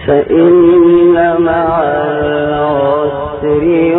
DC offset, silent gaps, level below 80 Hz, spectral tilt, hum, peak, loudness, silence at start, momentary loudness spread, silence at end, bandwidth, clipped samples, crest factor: under 0.1%; none; -36 dBFS; -11.5 dB/octave; none; 0 dBFS; -10 LUFS; 0 s; 8 LU; 0 s; 3.9 kHz; under 0.1%; 10 dB